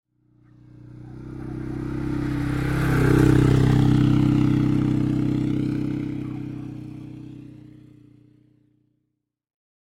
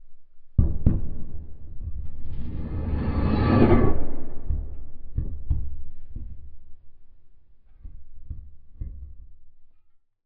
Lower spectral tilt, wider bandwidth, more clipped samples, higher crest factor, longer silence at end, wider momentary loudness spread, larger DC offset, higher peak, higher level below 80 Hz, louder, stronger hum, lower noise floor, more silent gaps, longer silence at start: about the same, -8 dB/octave vs -8.5 dB/octave; first, 13 kHz vs 4.7 kHz; neither; about the same, 18 dB vs 20 dB; first, 2.2 s vs 0.55 s; about the same, 21 LU vs 23 LU; neither; about the same, -6 dBFS vs -4 dBFS; second, -38 dBFS vs -32 dBFS; first, -22 LUFS vs -26 LUFS; first, 60 Hz at -65 dBFS vs none; first, -78 dBFS vs -54 dBFS; neither; first, 0.8 s vs 0 s